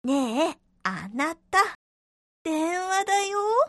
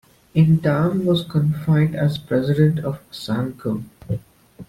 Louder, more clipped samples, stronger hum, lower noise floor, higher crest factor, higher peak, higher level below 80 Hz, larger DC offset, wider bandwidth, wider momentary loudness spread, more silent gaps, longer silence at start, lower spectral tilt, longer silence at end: second, -26 LUFS vs -20 LUFS; neither; neither; first, under -90 dBFS vs -43 dBFS; about the same, 18 dB vs 16 dB; second, -8 dBFS vs -4 dBFS; second, -66 dBFS vs -50 dBFS; neither; second, 12 kHz vs 13.5 kHz; second, 8 LU vs 13 LU; first, 1.75-2.45 s vs none; second, 0.05 s vs 0.35 s; second, -3 dB/octave vs -8.5 dB/octave; about the same, 0 s vs 0.05 s